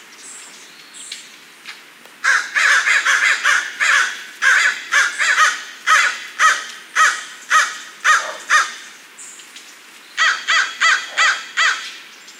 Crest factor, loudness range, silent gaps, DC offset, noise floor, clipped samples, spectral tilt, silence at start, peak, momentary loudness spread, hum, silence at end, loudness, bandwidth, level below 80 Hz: 16 dB; 4 LU; none; under 0.1%; -42 dBFS; under 0.1%; 3.5 dB/octave; 0.1 s; -2 dBFS; 22 LU; none; 0.05 s; -15 LUFS; 16 kHz; -80 dBFS